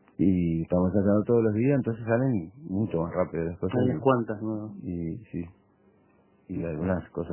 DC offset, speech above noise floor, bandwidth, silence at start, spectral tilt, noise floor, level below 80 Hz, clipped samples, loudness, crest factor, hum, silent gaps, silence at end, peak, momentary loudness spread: under 0.1%; 36 dB; 3.2 kHz; 0.2 s; -12.5 dB/octave; -62 dBFS; -48 dBFS; under 0.1%; -27 LUFS; 18 dB; none; none; 0 s; -10 dBFS; 11 LU